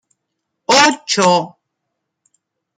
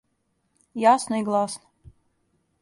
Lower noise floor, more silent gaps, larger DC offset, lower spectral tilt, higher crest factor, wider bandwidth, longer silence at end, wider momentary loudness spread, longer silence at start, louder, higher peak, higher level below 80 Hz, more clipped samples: first, -76 dBFS vs -72 dBFS; neither; neither; second, -2.5 dB/octave vs -4.5 dB/octave; about the same, 18 dB vs 20 dB; first, 15.5 kHz vs 11.5 kHz; first, 1.3 s vs 1.05 s; about the same, 18 LU vs 18 LU; about the same, 0.7 s vs 0.75 s; first, -13 LUFS vs -22 LUFS; first, 0 dBFS vs -6 dBFS; about the same, -66 dBFS vs -64 dBFS; neither